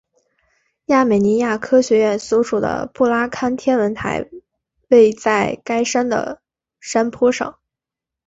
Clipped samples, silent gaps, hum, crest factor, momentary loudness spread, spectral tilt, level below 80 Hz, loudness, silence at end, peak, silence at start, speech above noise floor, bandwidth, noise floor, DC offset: under 0.1%; none; none; 16 dB; 11 LU; -5 dB/octave; -54 dBFS; -17 LUFS; 0.75 s; -2 dBFS; 0.9 s; 69 dB; 8 kHz; -86 dBFS; under 0.1%